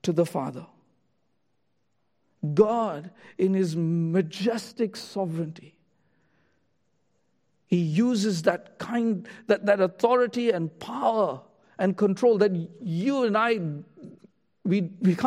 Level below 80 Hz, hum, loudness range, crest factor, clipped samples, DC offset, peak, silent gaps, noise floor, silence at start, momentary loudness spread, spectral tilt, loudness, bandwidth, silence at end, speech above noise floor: -74 dBFS; none; 6 LU; 20 dB; under 0.1%; under 0.1%; -6 dBFS; none; -76 dBFS; 0.05 s; 11 LU; -7 dB/octave; -26 LUFS; 14 kHz; 0 s; 51 dB